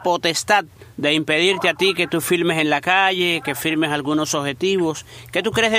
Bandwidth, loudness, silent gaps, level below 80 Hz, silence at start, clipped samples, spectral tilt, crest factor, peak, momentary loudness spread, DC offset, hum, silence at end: 16 kHz; -19 LUFS; none; -56 dBFS; 0 s; under 0.1%; -3.5 dB/octave; 18 dB; -2 dBFS; 7 LU; under 0.1%; none; 0 s